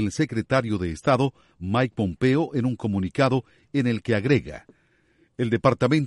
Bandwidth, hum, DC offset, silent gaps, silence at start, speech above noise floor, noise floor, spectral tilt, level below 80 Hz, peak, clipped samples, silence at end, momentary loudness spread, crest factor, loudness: 11.5 kHz; none; under 0.1%; none; 0 s; 40 dB; -63 dBFS; -7 dB/octave; -50 dBFS; -6 dBFS; under 0.1%; 0 s; 6 LU; 18 dB; -24 LUFS